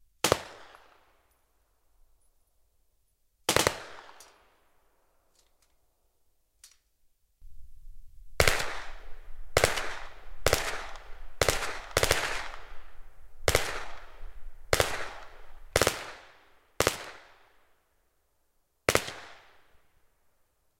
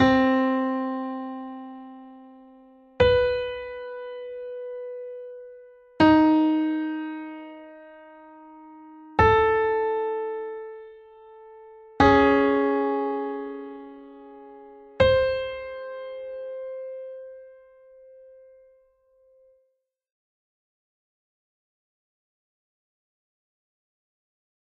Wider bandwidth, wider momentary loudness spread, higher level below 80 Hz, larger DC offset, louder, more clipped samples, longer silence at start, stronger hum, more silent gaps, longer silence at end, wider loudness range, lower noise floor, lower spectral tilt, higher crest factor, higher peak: first, 16.5 kHz vs 7 kHz; about the same, 23 LU vs 25 LU; about the same, -44 dBFS vs -48 dBFS; neither; second, -29 LUFS vs -24 LUFS; neither; first, 0.25 s vs 0 s; neither; neither; second, 1.4 s vs 7.25 s; second, 6 LU vs 10 LU; about the same, -72 dBFS vs -74 dBFS; second, -2.5 dB/octave vs -7.5 dB/octave; first, 32 dB vs 22 dB; first, 0 dBFS vs -6 dBFS